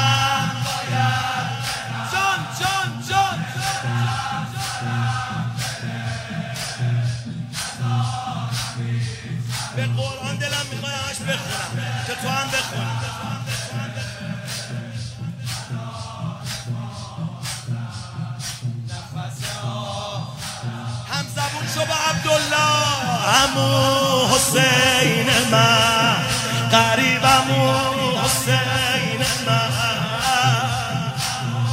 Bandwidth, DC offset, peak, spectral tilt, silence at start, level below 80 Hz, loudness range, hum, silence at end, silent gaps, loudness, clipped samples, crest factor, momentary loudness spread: 16 kHz; under 0.1%; 0 dBFS; -3.5 dB/octave; 0 s; -48 dBFS; 13 LU; none; 0 s; none; -21 LUFS; under 0.1%; 20 dB; 14 LU